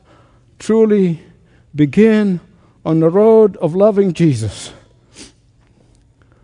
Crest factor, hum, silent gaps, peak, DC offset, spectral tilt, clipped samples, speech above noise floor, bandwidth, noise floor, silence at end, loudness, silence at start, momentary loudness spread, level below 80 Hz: 14 dB; none; none; 0 dBFS; under 0.1%; -7.5 dB/octave; under 0.1%; 39 dB; 10.5 kHz; -51 dBFS; 1.2 s; -13 LUFS; 0.6 s; 18 LU; -52 dBFS